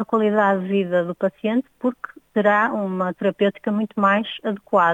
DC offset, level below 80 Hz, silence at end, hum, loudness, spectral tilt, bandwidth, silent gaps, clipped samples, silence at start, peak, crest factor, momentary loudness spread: under 0.1%; -70 dBFS; 0 s; none; -21 LUFS; -7.5 dB/octave; 7.6 kHz; none; under 0.1%; 0 s; -6 dBFS; 14 dB; 8 LU